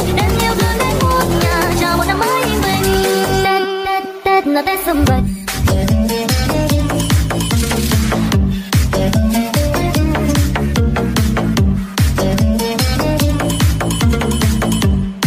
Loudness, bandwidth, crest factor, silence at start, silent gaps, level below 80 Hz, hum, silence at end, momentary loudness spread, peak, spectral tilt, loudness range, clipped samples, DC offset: -15 LUFS; 16 kHz; 12 dB; 0 s; none; -22 dBFS; none; 0 s; 2 LU; -2 dBFS; -5 dB/octave; 1 LU; under 0.1%; under 0.1%